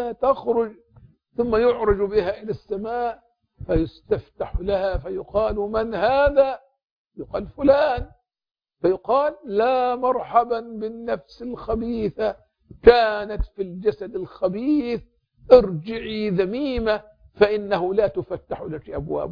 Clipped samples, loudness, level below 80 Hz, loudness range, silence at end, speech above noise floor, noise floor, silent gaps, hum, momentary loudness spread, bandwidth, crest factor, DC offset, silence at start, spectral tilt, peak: under 0.1%; -22 LUFS; -40 dBFS; 4 LU; 0 s; 32 dB; -53 dBFS; 6.85-7.05 s; none; 14 LU; 5.2 kHz; 22 dB; under 0.1%; 0 s; -8.5 dB/octave; 0 dBFS